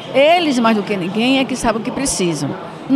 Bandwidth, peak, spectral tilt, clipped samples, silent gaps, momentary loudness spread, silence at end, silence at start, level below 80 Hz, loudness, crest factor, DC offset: 15 kHz; -2 dBFS; -4 dB/octave; under 0.1%; none; 9 LU; 0 s; 0 s; -44 dBFS; -16 LUFS; 14 dB; under 0.1%